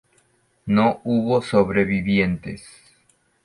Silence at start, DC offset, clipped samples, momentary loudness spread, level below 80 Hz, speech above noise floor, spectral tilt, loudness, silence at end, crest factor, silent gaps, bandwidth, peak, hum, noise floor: 0.65 s; under 0.1%; under 0.1%; 16 LU; -48 dBFS; 43 dB; -7.5 dB/octave; -20 LUFS; 0.85 s; 18 dB; none; 11.5 kHz; -4 dBFS; none; -63 dBFS